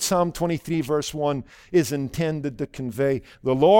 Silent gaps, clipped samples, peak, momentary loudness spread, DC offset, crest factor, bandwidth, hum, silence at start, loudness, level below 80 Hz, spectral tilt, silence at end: none; under 0.1%; -4 dBFS; 8 LU; under 0.1%; 18 dB; 17 kHz; none; 0 s; -25 LUFS; -50 dBFS; -5.5 dB/octave; 0 s